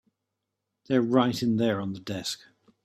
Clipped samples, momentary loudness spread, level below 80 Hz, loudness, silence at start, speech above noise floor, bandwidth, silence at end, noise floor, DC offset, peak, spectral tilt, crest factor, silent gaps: under 0.1%; 10 LU; -66 dBFS; -27 LUFS; 0.9 s; 58 dB; 14.5 kHz; 0.5 s; -84 dBFS; under 0.1%; -8 dBFS; -5.5 dB/octave; 20 dB; none